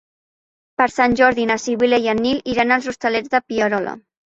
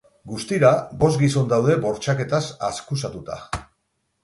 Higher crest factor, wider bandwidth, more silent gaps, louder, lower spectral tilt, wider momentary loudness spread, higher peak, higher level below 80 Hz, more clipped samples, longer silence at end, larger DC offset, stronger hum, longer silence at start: about the same, 18 dB vs 20 dB; second, 8 kHz vs 11.5 kHz; neither; first, -18 LUFS vs -21 LUFS; second, -4 dB/octave vs -6 dB/octave; second, 7 LU vs 15 LU; about the same, 0 dBFS vs -2 dBFS; about the same, -50 dBFS vs -48 dBFS; neither; second, 0.3 s vs 0.6 s; neither; neither; first, 0.8 s vs 0.25 s